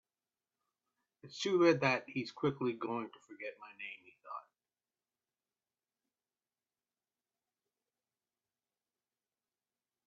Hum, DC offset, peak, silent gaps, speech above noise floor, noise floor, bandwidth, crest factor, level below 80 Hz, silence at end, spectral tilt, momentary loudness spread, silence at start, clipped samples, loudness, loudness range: none; under 0.1%; -16 dBFS; none; over 55 dB; under -90 dBFS; 7.4 kHz; 26 dB; -84 dBFS; 5.65 s; -4 dB/octave; 20 LU; 1.25 s; under 0.1%; -34 LUFS; 20 LU